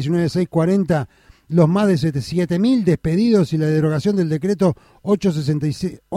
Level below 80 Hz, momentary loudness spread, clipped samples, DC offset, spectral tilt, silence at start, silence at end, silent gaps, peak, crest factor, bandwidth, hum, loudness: -48 dBFS; 6 LU; under 0.1%; under 0.1%; -8 dB/octave; 0 s; 0 s; none; -2 dBFS; 16 dB; 12.5 kHz; none; -18 LUFS